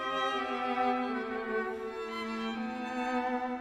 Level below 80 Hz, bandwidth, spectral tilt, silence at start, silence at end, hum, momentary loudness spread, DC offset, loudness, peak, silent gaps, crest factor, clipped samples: -66 dBFS; 12.5 kHz; -4.5 dB/octave; 0 s; 0 s; none; 6 LU; under 0.1%; -34 LUFS; -18 dBFS; none; 14 dB; under 0.1%